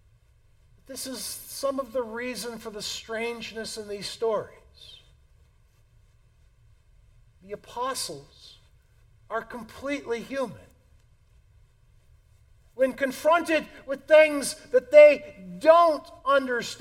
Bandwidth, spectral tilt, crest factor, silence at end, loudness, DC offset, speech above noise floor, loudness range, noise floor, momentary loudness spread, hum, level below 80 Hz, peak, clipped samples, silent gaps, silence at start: 16.5 kHz; -3 dB/octave; 24 dB; 0.05 s; -24 LUFS; under 0.1%; 36 dB; 18 LU; -60 dBFS; 18 LU; none; -60 dBFS; -4 dBFS; under 0.1%; none; 0.9 s